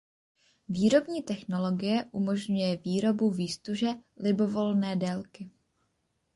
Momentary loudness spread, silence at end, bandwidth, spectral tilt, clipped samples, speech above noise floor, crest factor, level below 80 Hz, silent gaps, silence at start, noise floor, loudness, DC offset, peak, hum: 9 LU; 0.85 s; 11.5 kHz; -6.5 dB/octave; under 0.1%; 48 dB; 18 dB; -68 dBFS; none; 0.7 s; -76 dBFS; -29 LUFS; under 0.1%; -12 dBFS; none